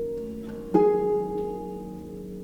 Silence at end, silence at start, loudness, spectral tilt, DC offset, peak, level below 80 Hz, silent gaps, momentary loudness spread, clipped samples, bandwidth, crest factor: 0 s; 0 s; -26 LUFS; -9 dB/octave; under 0.1%; -8 dBFS; -50 dBFS; none; 17 LU; under 0.1%; 14 kHz; 20 dB